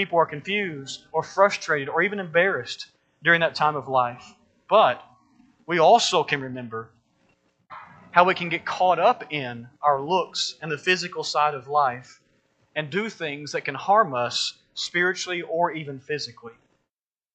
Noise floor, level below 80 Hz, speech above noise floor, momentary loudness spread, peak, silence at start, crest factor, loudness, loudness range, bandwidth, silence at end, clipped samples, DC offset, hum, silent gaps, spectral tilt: -87 dBFS; -72 dBFS; 64 dB; 15 LU; -2 dBFS; 0 s; 24 dB; -23 LUFS; 3 LU; 9 kHz; 0.8 s; under 0.1%; under 0.1%; none; none; -3.5 dB/octave